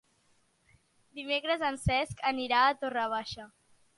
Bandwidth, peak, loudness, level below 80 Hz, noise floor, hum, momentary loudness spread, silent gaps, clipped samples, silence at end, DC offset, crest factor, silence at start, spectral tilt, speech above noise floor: 11.5 kHz; -14 dBFS; -30 LUFS; -52 dBFS; -70 dBFS; none; 17 LU; none; under 0.1%; 0.5 s; under 0.1%; 20 dB; 1.15 s; -4.5 dB/octave; 39 dB